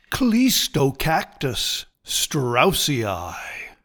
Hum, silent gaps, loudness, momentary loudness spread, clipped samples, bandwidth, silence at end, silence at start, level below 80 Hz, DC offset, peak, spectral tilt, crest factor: none; none; -21 LUFS; 11 LU; under 0.1%; 19 kHz; 0.1 s; 0.1 s; -42 dBFS; under 0.1%; -4 dBFS; -3.5 dB/octave; 18 dB